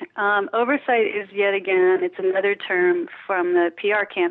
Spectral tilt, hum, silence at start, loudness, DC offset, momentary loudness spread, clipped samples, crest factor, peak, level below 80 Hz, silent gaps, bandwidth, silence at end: -8.5 dB/octave; none; 0 s; -21 LUFS; under 0.1%; 4 LU; under 0.1%; 12 dB; -10 dBFS; -78 dBFS; none; 4.1 kHz; 0 s